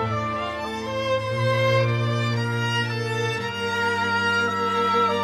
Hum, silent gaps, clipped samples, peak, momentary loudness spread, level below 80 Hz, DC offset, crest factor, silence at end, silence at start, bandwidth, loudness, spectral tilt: none; none; under 0.1%; -10 dBFS; 7 LU; -56 dBFS; under 0.1%; 14 dB; 0 s; 0 s; 14 kHz; -23 LUFS; -5.5 dB/octave